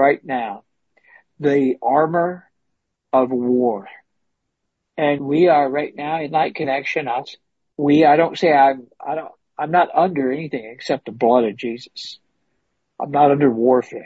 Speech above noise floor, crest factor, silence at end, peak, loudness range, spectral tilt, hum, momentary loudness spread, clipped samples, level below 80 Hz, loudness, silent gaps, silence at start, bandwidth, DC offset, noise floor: 58 dB; 18 dB; 0 s; -2 dBFS; 4 LU; -7 dB/octave; none; 16 LU; under 0.1%; -66 dBFS; -18 LUFS; none; 0 s; 8 kHz; under 0.1%; -76 dBFS